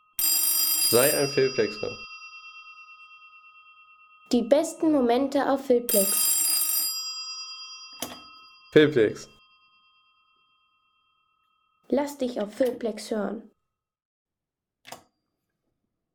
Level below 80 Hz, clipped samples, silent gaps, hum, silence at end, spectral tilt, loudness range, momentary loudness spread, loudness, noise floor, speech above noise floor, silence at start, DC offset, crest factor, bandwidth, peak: -66 dBFS; under 0.1%; 14.05-14.26 s; none; 1.2 s; -2.5 dB/octave; 11 LU; 20 LU; -23 LUFS; -88 dBFS; 64 dB; 0.2 s; under 0.1%; 22 dB; over 20 kHz; -6 dBFS